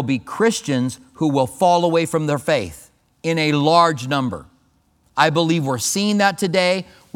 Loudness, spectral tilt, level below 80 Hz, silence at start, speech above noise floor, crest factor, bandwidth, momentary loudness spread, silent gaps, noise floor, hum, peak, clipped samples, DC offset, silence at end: -19 LUFS; -4.5 dB/octave; -56 dBFS; 0 s; 42 dB; 18 dB; 18.5 kHz; 9 LU; none; -60 dBFS; none; 0 dBFS; under 0.1%; under 0.1%; 0.35 s